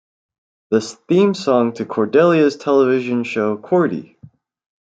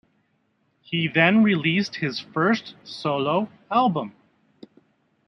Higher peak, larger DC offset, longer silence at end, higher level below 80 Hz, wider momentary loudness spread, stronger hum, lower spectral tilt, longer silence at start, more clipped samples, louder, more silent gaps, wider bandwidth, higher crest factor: about the same, -2 dBFS vs -4 dBFS; neither; second, 0.9 s vs 1.15 s; about the same, -66 dBFS vs -70 dBFS; second, 7 LU vs 12 LU; neither; about the same, -6.5 dB/octave vs -6.5 dB/octave; second, 0.7 s vs 0.9 s; neither; first, -17 LUFS vs -22 LUFS; neither; first, 9 kHz vs 6.4 kHz; about the same, 16 dB vs 20 dB